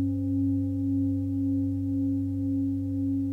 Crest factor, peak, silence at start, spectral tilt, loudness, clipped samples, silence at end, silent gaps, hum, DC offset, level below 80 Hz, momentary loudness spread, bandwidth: 8 dB; -18 dBFS; 0 s; -11.5 dB/octave; -28 LUFS; under 0.1%; 0 s; none; 50 Hz at -55 dBFS; under 0.1%; -56 dBFS; 2 LU; 0.9 kHz